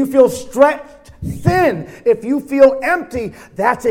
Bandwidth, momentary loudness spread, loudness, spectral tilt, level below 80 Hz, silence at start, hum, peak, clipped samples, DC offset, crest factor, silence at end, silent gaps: 16.5 kHz; 15 LU; -15 LUFS; -6.5 dB/octave; -42 dBFS; 0 s; none; 0 dBFS; 0.1%; under 0.1%; 14 dB; 0 s; none